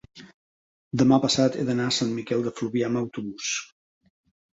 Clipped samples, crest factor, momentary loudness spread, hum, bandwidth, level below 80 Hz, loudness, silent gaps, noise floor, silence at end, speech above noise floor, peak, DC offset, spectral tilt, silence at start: under 0.1%; 18 dB; 11 LU; none; 8 kHz; -62 dBFS; -25 LUFS; 0.34-0.91 s; under -90 dBFS; 0.9 s; over 66 dB; -8 dBFS; under 0.1%; -4.5 dB/octave; 0.15 s